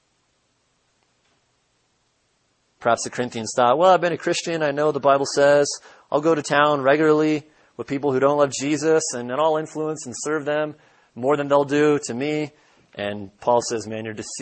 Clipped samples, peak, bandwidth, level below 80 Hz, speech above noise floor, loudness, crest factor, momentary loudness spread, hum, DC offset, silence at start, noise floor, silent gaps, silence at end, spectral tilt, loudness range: under 0.1%; -2 dBFS; 8.8 kHz; -68 dBFS; 47 dB; -21 LUFS; 18 dB; 13 LU; none; under 0.1%; 2.8 s; -67 dBFS; none; 0 s; -4.5 dB/octave; 4 LU